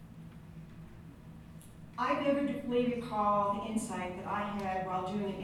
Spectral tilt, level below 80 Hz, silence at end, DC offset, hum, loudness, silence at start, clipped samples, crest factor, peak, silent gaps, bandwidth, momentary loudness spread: -6 dB/octave; -60 dBFS; 0 s; under 0.1%; none; -34 LUFS; 0 s; under 0.1%; 16 dB; -18 dBFS; none; 15.5 kHz; 21 LU